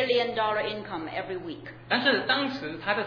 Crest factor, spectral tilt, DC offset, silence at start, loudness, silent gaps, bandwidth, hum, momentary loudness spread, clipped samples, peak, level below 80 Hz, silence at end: 18 dB; -5.5 dB/octave; under 0.1%; 0 s; -27 LUFS; none; 5.4 kHz; none; 12 LU; under 0.1%; -10 dBFS; -62 dBFS; 0 s